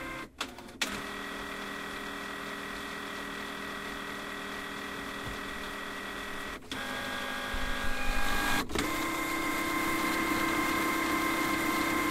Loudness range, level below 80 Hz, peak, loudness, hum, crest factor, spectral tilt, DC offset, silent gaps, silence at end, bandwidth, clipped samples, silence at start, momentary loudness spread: 8 LU; -44 dBFS; -14 dBFS; -33 LUFS; none; 18 dB; -3 dB/octave; under 0.1%; none; 0 s; 16 kHz; under 0.1%; 0 s; 9 LU